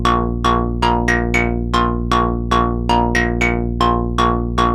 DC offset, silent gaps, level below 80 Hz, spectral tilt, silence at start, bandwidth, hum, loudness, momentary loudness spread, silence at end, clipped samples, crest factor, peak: under 0.1%; none; -24 dBFS; -6 dB/octave; 0 s; 12 kHz; 60 Hz at -25 dBFS; -17 LUFS; 2 LU; 0 s; under 0.1%; 16 dB; 0 dBFS